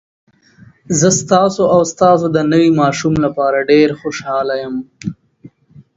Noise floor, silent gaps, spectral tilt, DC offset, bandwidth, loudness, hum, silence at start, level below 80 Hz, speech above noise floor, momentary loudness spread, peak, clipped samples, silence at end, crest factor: -45 dBFS; none; -5 dB/octave; under 0.1%; 8 kHz; -13 LUFS; none; 0.9 s; -48 dBFS; 32 dB; 12 LU; 0 dBFS; under 0.1%; 0.5 s; 14 dB